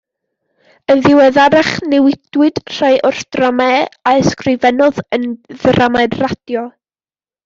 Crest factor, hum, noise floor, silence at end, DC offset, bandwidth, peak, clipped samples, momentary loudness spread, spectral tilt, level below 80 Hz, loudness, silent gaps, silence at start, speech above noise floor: 12 dB; none; under -90 dBFS; 0.75 s; under 0.1%; 7.6 kHz; 0 dBFS; under 0.1%; 11 LU; -5.5 dB/octave; -48 dBFS; -12 LUFS; none; 0.9 s; over 78 dB